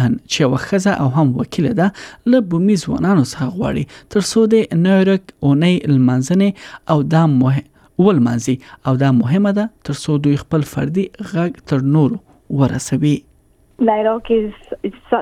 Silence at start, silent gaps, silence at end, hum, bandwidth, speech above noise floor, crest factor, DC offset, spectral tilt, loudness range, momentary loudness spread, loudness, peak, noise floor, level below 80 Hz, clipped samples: 0 s; none; 0 s; none; 14 kHz; 37 dB; 14 dB; under 0.1%; -7 dB/octave; 3 LU; 8 LU; -16 LUFS; -2 dBFS; -53 dBFS; -46 dBFS; under 0.1%